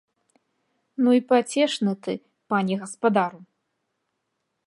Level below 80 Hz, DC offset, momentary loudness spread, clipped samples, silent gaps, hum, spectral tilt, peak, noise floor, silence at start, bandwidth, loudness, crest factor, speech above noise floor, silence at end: -78 dBFS; under 0.1%; 12 LU; under 0.1%; none; none; -5.5 dB/octave; -6 dBFS; -78 dBFS; 1 s; 11.5 kHz; -23 LUFS; 20 dB; 56 dB; 1.25 s